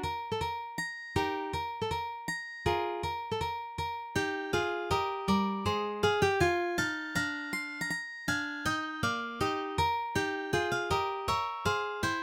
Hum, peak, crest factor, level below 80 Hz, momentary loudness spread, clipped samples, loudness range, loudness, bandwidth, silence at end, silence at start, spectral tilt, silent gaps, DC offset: none; -14 dBFS; 18 dB; -52 dBFS; 6 LU; under 0.1%; 4 LU; -32 LUFS; 17 kHz; 0 s; 0 s; -4.5 dB/octave; none; under 0.1%